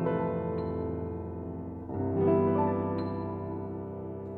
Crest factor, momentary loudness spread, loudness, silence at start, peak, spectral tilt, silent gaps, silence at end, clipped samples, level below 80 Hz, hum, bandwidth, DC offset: 16 dB; 13 LU; -32 LUFS; 0 s; -14 dBFS; -12 dB/octave; none; 0 s; under 0.1%; -54 dBFS; none; 4.4 kHz; under 0.1%